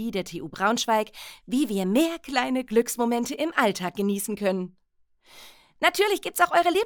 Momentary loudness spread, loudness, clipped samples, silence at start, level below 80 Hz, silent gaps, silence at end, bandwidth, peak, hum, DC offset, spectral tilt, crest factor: 9 LU; -25 LUFS; under 0.1%; 0 s; -60 dBFS; none; 0 s; over 20 kHz; -6 dBFS; none; under 0.1%; -4 dB/octave; 20 dB